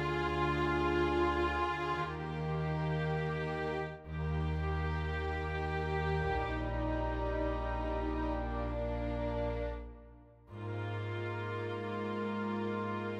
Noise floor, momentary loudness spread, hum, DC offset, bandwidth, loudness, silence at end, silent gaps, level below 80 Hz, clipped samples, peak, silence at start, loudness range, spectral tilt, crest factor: -56 dBFS; 7 LU; none; under 0.1%; 9 kHz; -36 LUFS; 0 s; none; -42 dBFS; under 0.1%; -20 dBFS; 0 s; 5 LU; -7.5 dB/octave; 14 dB